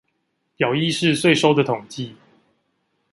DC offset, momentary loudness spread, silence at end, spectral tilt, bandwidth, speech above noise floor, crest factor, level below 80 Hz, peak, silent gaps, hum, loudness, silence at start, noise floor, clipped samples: under 0.1%; 17 LU; 1 s; -5 dB/octave; 11.5 kHz; 53 dB; 20 dB; -64 dBFS; -2 dBFS; none; none; -19 LUFS; 0.6 s; -72 dBFS; under 0.1%